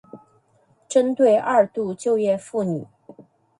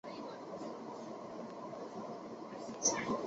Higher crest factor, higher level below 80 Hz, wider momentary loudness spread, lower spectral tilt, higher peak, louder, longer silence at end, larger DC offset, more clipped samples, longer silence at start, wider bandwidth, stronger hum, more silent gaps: second, 18 dB vs 24 dB; first, -68 dBFS vs -76 dBFS; second, 8 LU vs 13 LU; first, -6 dB/octave vs -3.5 dB/octave; first, -4 dBFS vs -18 dBFS; first, -21 LUFS vs -41 LUFS; first, 0.4 s vs 0 s; neither; neither; about the same, 0.15 s vs 0.05 s; first, 11 kHz vs 8 kHz; neither; neither